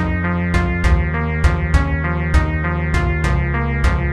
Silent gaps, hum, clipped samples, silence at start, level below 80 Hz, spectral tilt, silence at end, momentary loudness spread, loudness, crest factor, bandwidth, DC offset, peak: none; none; under 0.1%; 0 s; -20 dBFS; -7 dB/octave; 0 s; 2 LU; -18 LUFS; 16 dB; 11 kHz; under 0.1%; 0 dBFS